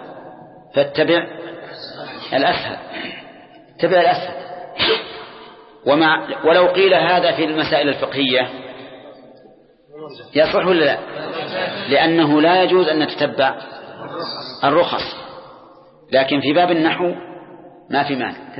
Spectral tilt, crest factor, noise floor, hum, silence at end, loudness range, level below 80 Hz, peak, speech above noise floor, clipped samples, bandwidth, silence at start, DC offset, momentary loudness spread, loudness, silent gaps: -10 dB/octave; 16 dB; -48 dBFS; none; 0 s; 5 LU; -58 dBFS; -2 dBFS; 32 dB; under 0.1%; 5.8 kHz; 0 s; under 0.1%; 20 LU; -17 LUFS; none